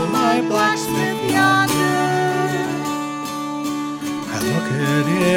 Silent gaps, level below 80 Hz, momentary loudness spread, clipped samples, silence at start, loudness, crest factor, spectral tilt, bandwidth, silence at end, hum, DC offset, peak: none; -56 dBFS; 9 LU; under 0.1%; 0 s; -19 LUFS; 16 dB; -4.5 dB/octave; 18.5 kHz; 0 s; none; under 0.1%; -4 dBFS